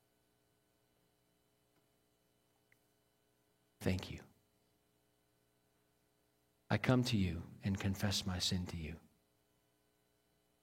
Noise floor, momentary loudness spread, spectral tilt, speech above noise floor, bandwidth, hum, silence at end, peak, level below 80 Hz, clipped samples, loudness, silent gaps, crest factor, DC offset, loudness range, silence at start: -78 dBFS; 16 LU; -5 dB/octave; 40 dB; 16 kHz; 60 Hz at -75 dBFS; 1.65 s; -16 dBFS; -64 dBFS; under 0.1%; -38 LUFS; none; 28 dB; under 0.1%; 10 LU; 3.8 s